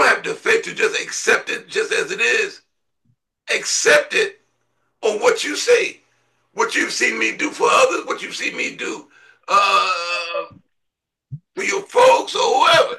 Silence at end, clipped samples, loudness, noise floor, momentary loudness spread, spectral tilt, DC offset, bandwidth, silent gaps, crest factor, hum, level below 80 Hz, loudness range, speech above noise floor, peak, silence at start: 0 s; under 0.1%; -18 LUFS; -78 dBFS; 12 LU; -1 dB/octave; under 0.1%; 12.5 kHz; none; 18 dB; none; -68 dBFS; 3 LU; 60 dB; -2 dBFS; 0 s